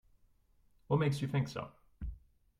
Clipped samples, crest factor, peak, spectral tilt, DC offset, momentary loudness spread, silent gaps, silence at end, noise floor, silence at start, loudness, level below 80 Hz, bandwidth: under 0.1%; 20 dB; -18 dBFS; -7.5 dB/octave; under 0.1%; 16 LU; none; 0.4 s; -69 dBFS; 0.9 s; -35 LUFS; -54 dBFS; 12.5 kHz